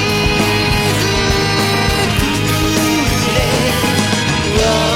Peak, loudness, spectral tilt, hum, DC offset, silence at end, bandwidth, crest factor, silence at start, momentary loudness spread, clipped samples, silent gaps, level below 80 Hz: 0 dBFS; -14 LUFS; -4 dB/octave; none; under 0.1%; 0 s; 16.5 kHz; 14 dB; 0 s; 1 LU; under 0.1%; none; -26 dBFS